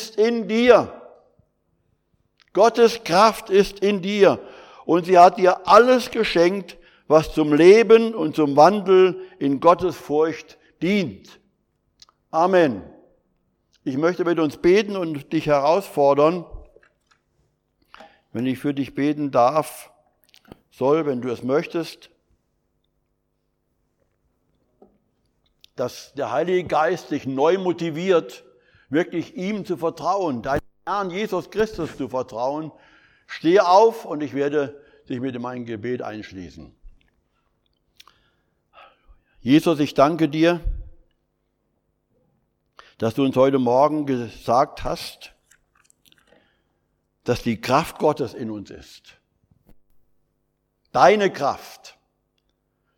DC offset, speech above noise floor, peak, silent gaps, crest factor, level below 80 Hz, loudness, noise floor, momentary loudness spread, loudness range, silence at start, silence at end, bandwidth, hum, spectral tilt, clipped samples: under 0.1%; 53 dB; -2 dBFS; none; 20 dB; -48 dBFS; -20 LUFS; -72 dBFS; 16 LU; 12 LU; 0 s; 1.05 s; 17 kHz; none; -6 dB/octave; under 0.1%